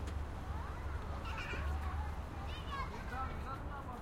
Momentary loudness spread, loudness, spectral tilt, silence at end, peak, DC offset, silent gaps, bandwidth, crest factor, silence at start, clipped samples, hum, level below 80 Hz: 4 LU; -43 LUFS; -6 dB/octave; 0 s; -28 dBFS; under 0.1%; none; 14 kHz; 12 dB; 0 s; under 0.1%; none; -44 dBFS